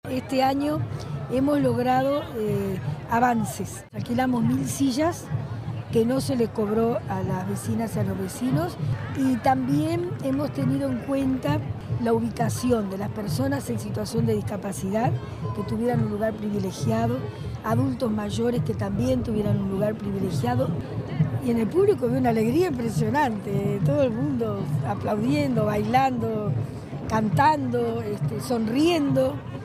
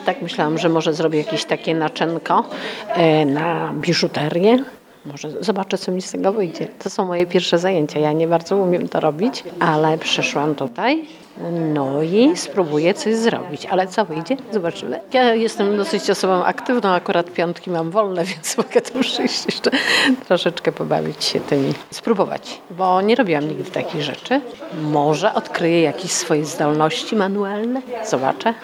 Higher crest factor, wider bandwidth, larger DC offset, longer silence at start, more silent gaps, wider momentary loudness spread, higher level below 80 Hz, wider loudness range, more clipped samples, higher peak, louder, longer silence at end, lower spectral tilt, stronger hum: about the same, 16 dB vs 18 dB; about the same, 15.5 kHz vs 16.5 kHz; neither; about the same, 0.05 s vs 0 s; neither; about the same, 7 LU vs 8 LU; first, -48 dBFS vs -68 dBFS; about the same, 3 LU vs 2 LU; neither; second, -8 dBFS vs 0 dBFS; second, -25 LUFS vs -19 LUFS; about the same, 0 s vs 0 s; first, -7 dB/octave vs -4.5 dB/octave; neither